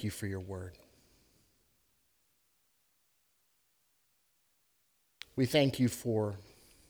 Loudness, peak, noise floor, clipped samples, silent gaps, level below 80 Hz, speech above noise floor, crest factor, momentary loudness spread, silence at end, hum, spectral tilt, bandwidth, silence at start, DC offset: -33 LUFS; -16 dBFS; -75 dBFS; under 0.1%; none; -68 dBFS; 43 dB; 22 dB; 21 LU; 0.45 s; none; -5.5 dB/octave; over 20 kHz; 0 s; under 0.1%